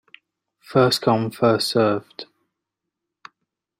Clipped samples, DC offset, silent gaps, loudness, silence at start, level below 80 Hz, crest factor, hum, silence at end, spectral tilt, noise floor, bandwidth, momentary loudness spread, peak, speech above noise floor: under 0.1%; under 0.1%; none; -20 LUFS; 0.7 s; -64 dBFS; 20 dB; none; 1.55 s; -5.5 dB/octave; -83 dBFS; 16 kHz; 14 LU; -2 dBFS; 63 dB